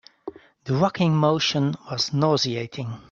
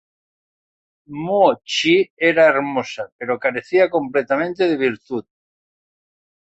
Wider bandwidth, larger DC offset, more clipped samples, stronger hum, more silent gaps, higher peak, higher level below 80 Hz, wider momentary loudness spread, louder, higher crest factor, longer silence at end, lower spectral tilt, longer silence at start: about the same, 7.6 kHz vs 8 kHz; neither; neither; neither; second, none vs 2.10-2.17 s, 3.12-3.19 s; second, -6 dBFS vs -2 dBFS; about the same, -60 dBFS vs -64 dBFS; first, 20 LU vs 14 LU; second, -22 LUFS vs -18 LUFS; about the same, 18 dB vs 18 dB; second, 0.1 s vs 1.35 s; about the same, -5.5 dB/octave vs -4.5 dB/octave; second, 0.25 s vs 1.1 s